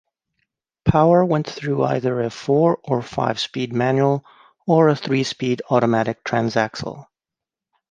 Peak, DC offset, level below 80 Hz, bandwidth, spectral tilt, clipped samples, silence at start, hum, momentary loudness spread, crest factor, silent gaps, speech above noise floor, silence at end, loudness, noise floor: -2 dBFS; under 0.1%; -48 dBFS; 9.4 kHz; -6.5 dB/octave; under 0.1%; 0.85 s; none; 8 LU; 18 dB; none; 68 dB; 0.9 s; -20 LUFS; -88 dBFS